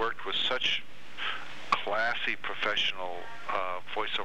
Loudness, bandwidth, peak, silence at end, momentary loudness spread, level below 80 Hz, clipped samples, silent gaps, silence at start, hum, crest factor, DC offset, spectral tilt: -31 LUFS; 16 kHz; -10 dBFS; 0 s; 11 LU; -68 dBFS; under 0.1%; none; 0 s; none; 22 dB; 2%; -2 dB/octave